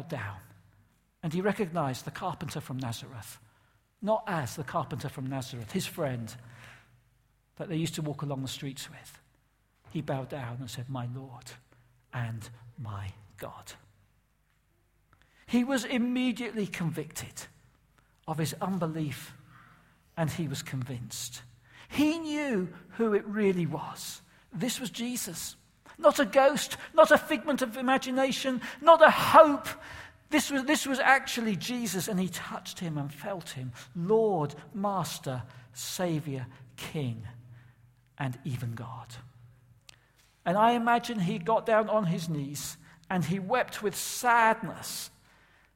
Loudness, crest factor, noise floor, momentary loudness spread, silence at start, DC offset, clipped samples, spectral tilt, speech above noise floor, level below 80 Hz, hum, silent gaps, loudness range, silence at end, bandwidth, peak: -29 LUFS; 26 dB; -70 dBFS; 20 LU; 0 s; under 0.1%; under 0.1%; -5 dB/octave; 41 dB; -64 dBFS; none; none; 16 LU; 0.7 s; 16.5 kHz; -4 dBFS